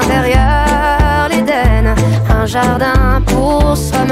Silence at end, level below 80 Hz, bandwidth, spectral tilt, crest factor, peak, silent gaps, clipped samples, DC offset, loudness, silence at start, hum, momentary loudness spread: 0 s; -16 dBFS; 15.5 kHz; -6 dB/octave; 10 dB; -2 dBFS; none; under 0.1%; under 0.1%; -12 LUFS; 0 s; none; 2 LU